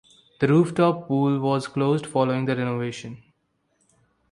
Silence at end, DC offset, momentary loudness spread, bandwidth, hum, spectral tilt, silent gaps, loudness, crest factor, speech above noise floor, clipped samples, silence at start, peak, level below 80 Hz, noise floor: 1.15 s; under 0.1%; 10 LU; 11 kHz; none; -7.5 dB/octave; none; -23 LUFS; 18 dB; 49 dB; under 0.1%; 0.4 s; -6 dBFS; -64 dBFS; -71 dBFS